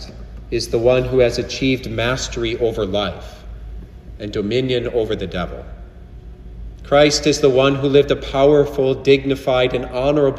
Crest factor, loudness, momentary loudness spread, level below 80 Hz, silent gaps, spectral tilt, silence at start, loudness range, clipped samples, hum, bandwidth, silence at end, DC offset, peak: 18 dB; -17 LUFS; 22 LU; -34 dBFS; none; -5 dB/octave; 0 s; 9 LU; under 0.1%; none; 13 kHz; 0 s; under 0.1%; 0 dBFS